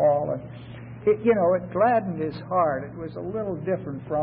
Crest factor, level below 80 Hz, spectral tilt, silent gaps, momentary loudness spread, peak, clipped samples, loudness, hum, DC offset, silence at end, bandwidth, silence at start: 16 dB; -56 dBFS; -12 dB/octave; none; 13 LU; -8 dBFS; under 0.1%; -25 LUFS; none; under 0.1%; 0 s; 5.2 kHz; 0 s